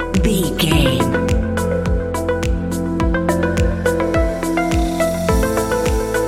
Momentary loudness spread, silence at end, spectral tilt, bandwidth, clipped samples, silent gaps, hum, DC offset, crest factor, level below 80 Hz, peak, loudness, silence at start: 4 LU; 0 s; -5.5 dB/octave; 16.5 kHz; under 0.1%; none; none; 0.2%; 16 dB; -24 dBFS; 0 dBFS; -18 LUFS; 0 s